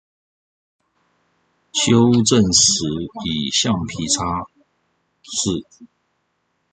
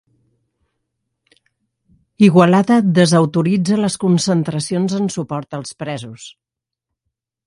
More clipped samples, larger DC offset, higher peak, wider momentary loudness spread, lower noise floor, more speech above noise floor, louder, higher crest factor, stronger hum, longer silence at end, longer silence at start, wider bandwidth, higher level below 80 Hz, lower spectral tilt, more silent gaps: neither; neither; about the same, -2 dBFS vs 0 dBFS; about the same, 13 LU vs 15 LU; second, -70 dBFS vs -81 dBFS; second, 52 dB vs 66 dB; about the same, -17 LUFS vs -15 LUFS; about the same, 18 dB vs 18 dB; neither; second, 0.85 s vs 1.15 s; second, 1.75 s vs 2.2 s; second, 9.6 kHz vs 11.5 kHz; first, -46 dBFS vs -58 dBFS; second, -3.5 dB/octave vs -6 dB/octave; neither